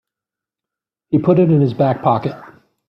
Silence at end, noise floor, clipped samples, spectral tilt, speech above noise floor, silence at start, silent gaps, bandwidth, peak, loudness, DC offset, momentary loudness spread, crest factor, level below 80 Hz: 0.45 s; -87 dBFS; under 0.1%; -11 dB/octave; 72 dB; 1.1 s; none; 5.6 kHz; -2 dBFS; -15 LUFS; under 0.1%; 7 LU; 16 dB; -56 dBFS